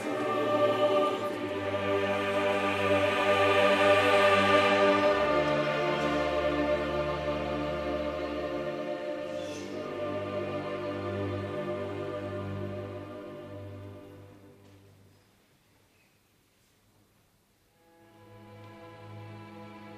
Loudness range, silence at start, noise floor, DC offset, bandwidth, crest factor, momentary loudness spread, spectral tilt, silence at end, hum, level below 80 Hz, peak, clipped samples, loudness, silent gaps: 16 LU; 0 s; -67 dBFS; under 0.1%; 14 kHz; 18 dB; 22 LU; -5.5 dB/octave; 0 s; none; -54 dBFS; -12 dBFS; under 0.1%; -28 LUFS; none